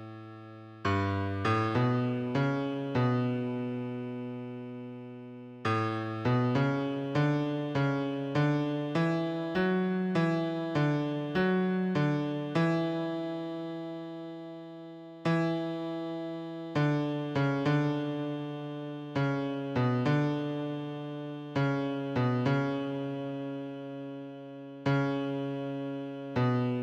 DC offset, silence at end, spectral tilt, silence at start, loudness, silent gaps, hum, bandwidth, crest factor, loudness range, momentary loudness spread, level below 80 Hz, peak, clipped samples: under 0.1%; 0 s; -8 dB/octave; 0 s; -31 LUFS; none; none; 8.4 kHz; 14 dB; 5 LU; 13 LU; -68 dBFS; -16 dBFS; under 0.1%